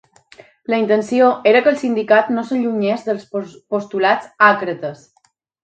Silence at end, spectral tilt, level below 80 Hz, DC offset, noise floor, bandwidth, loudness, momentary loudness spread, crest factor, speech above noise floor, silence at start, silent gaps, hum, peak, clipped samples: 0.7 s; -5.5 dB/octave; -68 dBFS; under 0.1%; -62 dBFS; 9 kHz; -17 LUFS; 13 LU; 16 dB; 45 dB; 0.7 s; none; none; 0 dBFS; under 0.1%